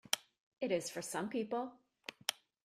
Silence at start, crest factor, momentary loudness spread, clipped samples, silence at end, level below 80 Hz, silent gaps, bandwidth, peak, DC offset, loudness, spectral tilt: 0.1 s; 30 dB; 10 LU; under 0.1%; 0.3 s; -84 dBFS; 0.40-0.52 s; 15.5 kHz; -10 dBFS; under 0.1%; -40 LUFS; -2.5 dB/octave